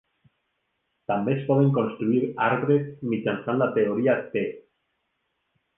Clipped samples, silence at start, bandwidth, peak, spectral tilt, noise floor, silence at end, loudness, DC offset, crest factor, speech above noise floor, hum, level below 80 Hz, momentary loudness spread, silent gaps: under 0.1%; 1.1 s; 3.8 kHz; -8 dBFS; -11 dB/octave; -76 dBFS; 1.2 s; -24 LUFS; under 0.1%; 18 dB; 52 dB; none; -68 dBFS; 8 LU; none